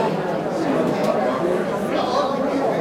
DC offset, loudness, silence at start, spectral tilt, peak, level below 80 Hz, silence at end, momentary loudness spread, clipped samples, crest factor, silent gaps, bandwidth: under 0.1%; -21 LUFS; 0 s; -6 dB/octave; -8 dBFS; -56 dBFS; 0 s; 3 LU; under 0.1%; 14 dB; none; 16.5 kHz